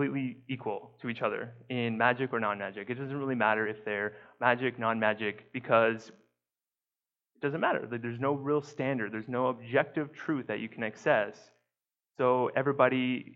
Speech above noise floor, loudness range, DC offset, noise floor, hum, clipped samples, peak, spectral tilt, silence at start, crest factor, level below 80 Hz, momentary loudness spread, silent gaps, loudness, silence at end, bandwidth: over 59 dB; 3 LU; under 0.1%; under -90 dBFS; none; under 0.1%; -8 dBFS; -7 dB/octave; 0 s; 24 dB; -80 dBFS; 11 LU; none; -31 LUFS; 0 s; 7.6 kHz